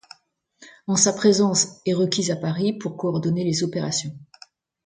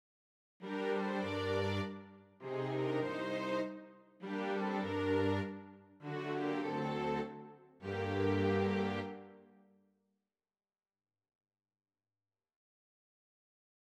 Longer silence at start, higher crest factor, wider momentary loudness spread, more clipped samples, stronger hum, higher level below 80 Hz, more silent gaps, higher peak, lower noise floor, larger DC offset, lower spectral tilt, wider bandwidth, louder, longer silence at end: about the same, 0.6 s vs 0.6 s; about the same, 20 dB vs 18 dB; second, 9 LU vs 18 LU; neither; neither; first, -64 dBFS vs -78 dBFS; neither; first, -4 dBFS vs -22 dBFS; second, -63 dBFS vs under -90 dBFS; neither; second, -4 dB/octave vs -7 dB/octave; second, 9.6 kHz vs 12 kHz; first, -22 LUFS vs -37 LUFS; second, 0.6 s vs 4.5 s